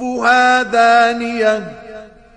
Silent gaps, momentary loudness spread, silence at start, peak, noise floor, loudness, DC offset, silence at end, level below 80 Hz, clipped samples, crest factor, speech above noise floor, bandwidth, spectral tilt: none; 14 LU; 0 s; -2 dBFS; -36 dBFS; -13 LUFS; under 0.1%; 0.3 s; -52 dBFS; under 0.1%; 14 dB; 23 dB; 9.8 kHz; -3 dB/octave